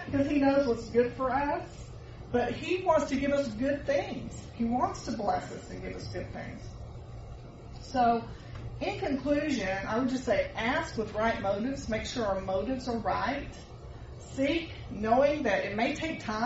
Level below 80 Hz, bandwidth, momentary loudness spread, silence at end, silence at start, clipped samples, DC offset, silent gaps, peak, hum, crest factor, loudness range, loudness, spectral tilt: -48 dBFS; 8 kHz; 18 LU; 0 s; 0 s; under 0.1%; under 0.1%; none; -12 dBFS; none; 18 dB; 5 LU; -30 LUFS; -4.5 dB/octave